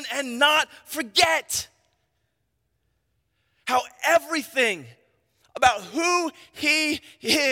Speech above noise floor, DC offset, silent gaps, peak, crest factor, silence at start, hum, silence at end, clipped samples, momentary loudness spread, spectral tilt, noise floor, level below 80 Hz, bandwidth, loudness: 51 dB; under 0.1%; none; -2 dBFS; 24 dB; 0 s; none; 0 s; under 0.1%; 12 LU; -1 dB/octave; -74 dBFS; -62 dBFS; 16.5 kHz; -22 LUFS